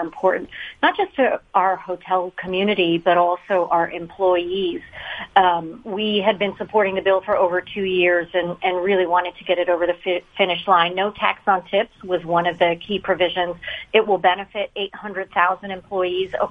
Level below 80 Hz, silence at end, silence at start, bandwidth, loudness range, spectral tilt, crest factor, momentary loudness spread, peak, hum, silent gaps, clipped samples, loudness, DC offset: -56 dBFS; 0 s; 0 s; 4.9 kHz; 1 LU; -7 dB/octave; 20 dB; 9 LU; 0 dBFS; none; none; under 0.1%; -20 LUFS; under 0.1%